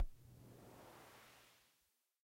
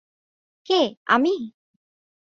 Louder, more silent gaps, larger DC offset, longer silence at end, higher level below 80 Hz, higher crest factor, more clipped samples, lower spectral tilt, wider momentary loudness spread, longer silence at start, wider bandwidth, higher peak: second, -59 LUFS vs -22 LUFS; second, none vs 0.97-1.06 s; neither; second, 0.65 s vs 0.85 s; first, -56 dBFS vs -72 dBFS; about the same, 22 dB vs 22 dB; neither; about the same, -5 dB/octave vs -4 dB/octave; about the same, 8 LU vs 10 LU; second, 0 s vs 0.7 s; first, 16 kHz vs 7.6 kHz; second, -28 dBFS vs -2 dBFS